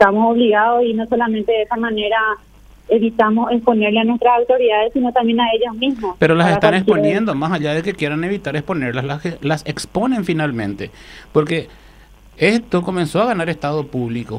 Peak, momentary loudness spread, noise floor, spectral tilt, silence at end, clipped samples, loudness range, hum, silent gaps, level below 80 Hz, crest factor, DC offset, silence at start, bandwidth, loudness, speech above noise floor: 0 dBFS; 8 LU; -44 dBFS; -6.5 dB/octave; 0 s; under 0.1%; 6 LU; none; none; -46 dBFS; 16 dB; under 0.1%; 0 s; 13 kHz; -17 LUFS; 28 dB